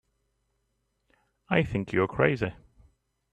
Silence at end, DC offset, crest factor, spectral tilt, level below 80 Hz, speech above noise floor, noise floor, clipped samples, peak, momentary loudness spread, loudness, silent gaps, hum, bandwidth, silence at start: 0.8 s; under 0.1%; 24 dB; -8 dB/octave; -54 dBFS; 50 dB; -76 dBFS; under 0.1%; -6 dBFS; 6 LU; -27 LUFS; none; none; 9.4 kHz; 1.5 s